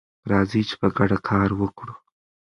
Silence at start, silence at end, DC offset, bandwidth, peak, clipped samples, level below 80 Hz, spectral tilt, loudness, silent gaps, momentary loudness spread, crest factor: 0.25 s; 0.55 s; under 0.1%; 10.5 kHz; -4 dBFS; under 0.1%; -44 dBFS; -7.5 dB/octave; -22 LUFS; none; 10 LU; 20 dB